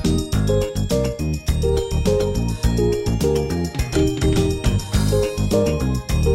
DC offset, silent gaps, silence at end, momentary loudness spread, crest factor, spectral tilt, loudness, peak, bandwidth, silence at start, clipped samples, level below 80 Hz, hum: under 0.1%; none; 0 s; 3 LU; 14 dB; -6 dB/octave; -20 LUFS; -4 dBFS; 16 kHz; 0 s; under 0.1%; -26 dBFS; none